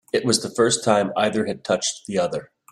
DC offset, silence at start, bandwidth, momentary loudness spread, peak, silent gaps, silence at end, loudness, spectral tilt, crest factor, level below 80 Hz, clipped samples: under 0.1%; 0.15 s; 14 kHz; 6 LU; -4 dBFS; none; 0.25 s; -21 LUFS; -3.5 dB/octave; 18 dB; -62 dBFS; under 0.1%